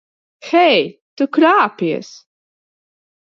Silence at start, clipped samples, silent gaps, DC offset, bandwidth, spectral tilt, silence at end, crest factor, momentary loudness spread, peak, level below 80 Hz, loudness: 0.45 s; under 0.1%; 1.01-1.17 s; under 0.1%; 7.2 kHz; -5 dB/octave; 1.2 s; 16 dB; 11 LU; 0 dBFS; -72 dBFS; -15 LUFS